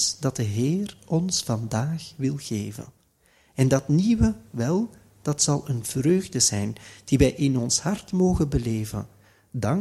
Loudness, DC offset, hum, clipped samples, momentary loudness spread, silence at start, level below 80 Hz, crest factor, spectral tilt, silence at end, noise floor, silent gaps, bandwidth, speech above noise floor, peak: -24 LUFS; under 0.1%; none; under 0.1%; 12 LU; 0 s; -42 dBFS; 20 dB; -5 dB/octave; 0 s; -62 dBFS; none; 15 kHz; 38 dB; -4 dBFS